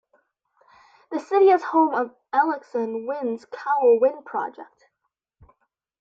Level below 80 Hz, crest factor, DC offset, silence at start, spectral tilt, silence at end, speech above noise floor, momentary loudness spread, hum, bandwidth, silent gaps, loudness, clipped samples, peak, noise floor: -72 dBFS; 16 dB; under 0.1%; 1.1 s; -6 dB/octave; 1.35 s; 57 dB; 13 LU; none; 7.4 kHz; none; -22 LUFS; under 0.1%; -8 dBFS; -79 dBFS